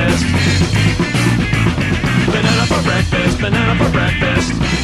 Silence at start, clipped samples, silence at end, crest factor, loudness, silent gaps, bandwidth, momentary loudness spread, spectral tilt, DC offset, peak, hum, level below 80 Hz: 0 s; under 0.1%; 0 s; 12 dB; -14 LUFS; none; 13 kHz; 2 LU; -5.5 dB/octave; under 0.1%; 0 dBFS; none; -26 dBFS